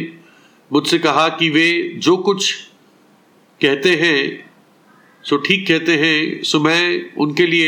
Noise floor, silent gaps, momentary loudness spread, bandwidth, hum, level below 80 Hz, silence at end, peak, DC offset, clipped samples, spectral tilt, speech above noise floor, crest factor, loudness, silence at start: -52 dBFS; none; 7 LU; 17.5 kHz; none; -68 dBFS; 0 s; -2 dBFS; under 0.1%; under 0.1%; -4 dB/octave; 36 dB; 16 dB; -15 LUFS; 0 s